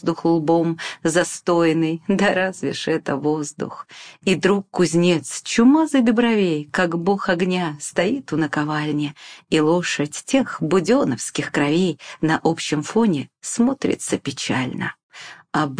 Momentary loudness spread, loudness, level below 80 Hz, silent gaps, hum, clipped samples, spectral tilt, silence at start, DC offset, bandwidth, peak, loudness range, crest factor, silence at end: 9 LU; -20 LUFS; -58 dBFS; 15.03-15.09 s; none; under 0.1%; -5 dB/octave; 0 s; under 0.1%; 10.5 kHz; -4 dBFS; 3 LU; 16 dB; 0 s